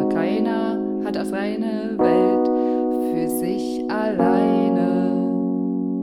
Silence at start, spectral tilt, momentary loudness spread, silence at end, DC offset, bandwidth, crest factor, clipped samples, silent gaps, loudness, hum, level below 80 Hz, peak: 0 s; -7 dB/octave; 7 LU; 0 s; under 0.1%; 16 kHz; 14 dB; under 0.1%; none; -21 LUFS; none; -58 dBFS; -6 dBFS